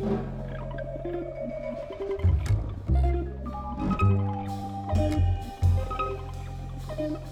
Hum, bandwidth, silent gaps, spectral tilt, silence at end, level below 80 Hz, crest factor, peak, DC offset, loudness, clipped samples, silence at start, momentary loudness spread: none; 9.8 kHz; none; -8.5 dB/octave; 0 s; -34 dBFS; 16 dB; -12 dBFS; under 0.1%; -29 LUFS; under 0.1%; 0 s; 11 LU